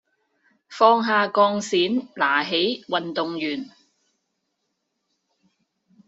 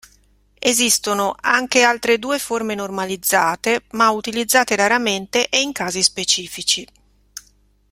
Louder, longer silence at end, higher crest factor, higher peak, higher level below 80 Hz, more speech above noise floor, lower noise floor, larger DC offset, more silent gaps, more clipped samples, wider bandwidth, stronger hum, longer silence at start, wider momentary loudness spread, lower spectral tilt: second, -21 LUFS vs -17 LUFS; first, 2.45 s vs 0.5 s; about the same, 22 dB vs 20 dB; about the same, -2 dBFS vs 0 dBFS; second, -74 dBFS vs -56 dBFS; first, 55 dB vs 38 dB; first, -77 dBFS vs -56 dBFS; neither; neither; neither; second, 8 kHz vs 16.5 kHz; second, none vs 50 Hz at -55 dBFS; about the same, 0.7 s vs 0.6 s; first, 11 LU vs 8 LU; about the same, -1.5 dB/octave vs -1.5 dB/octave